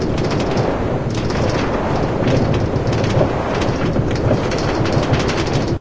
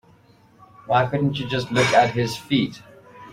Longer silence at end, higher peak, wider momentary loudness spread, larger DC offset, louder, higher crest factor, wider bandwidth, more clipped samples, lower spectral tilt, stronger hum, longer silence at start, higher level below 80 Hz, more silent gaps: about the same, 0 s vs 0 s; about the same, -2 dBFS vs -4 dBFS; second, 2 LU vs 9 LU; first, 2% vs under 0.1%; first, -18 LUFS vs -21 LUFS; about the same, 16 dB vs 20 dB; second, 8 kHz vs 16 kHz; neither; about the same, -6.5 dB/octave vs -5.5 dB/octave; neither; second, 0 s vs 0.85 s; first, -28 dBFS vs -54 dBFS; neither